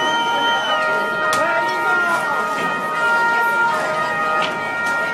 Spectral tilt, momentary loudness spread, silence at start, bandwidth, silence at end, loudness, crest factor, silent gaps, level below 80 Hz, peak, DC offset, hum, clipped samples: -2.5 dB/octave; 4 LU; 0 s; 16 kHz; 0 s; -18 LUFS; 12 dB; none; -62 dBFS; -6 dBFS; under 0.1%; none; under 0.1%